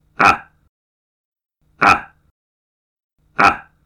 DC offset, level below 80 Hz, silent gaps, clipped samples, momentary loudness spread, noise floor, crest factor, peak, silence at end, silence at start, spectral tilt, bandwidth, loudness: under 0.1%; -48 dBFS; 0.69-1.32 s, 2.31-2.96 s, 3.04-3.10 s; under 0.1%; 7 LU; under -90 dBFS; 18 dB; -2 dBFS; 0.25 s; 0.2 s; -4 dB/octave; 14.5 kHz; -15 LUFS